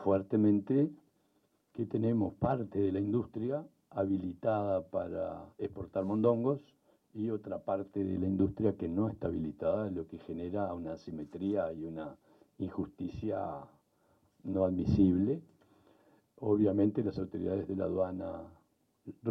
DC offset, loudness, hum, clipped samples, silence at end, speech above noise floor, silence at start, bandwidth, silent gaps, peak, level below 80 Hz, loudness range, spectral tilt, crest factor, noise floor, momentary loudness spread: under 0.1%; -34 LUFS; none; under 0.1%; 0 s; 41 dB; 0 s; 6 kHz; none; -16 dBFS; -62 dBFS; 6 LU; -10.5 dB/octave; 18 dB; -74 dBFS; 13 LU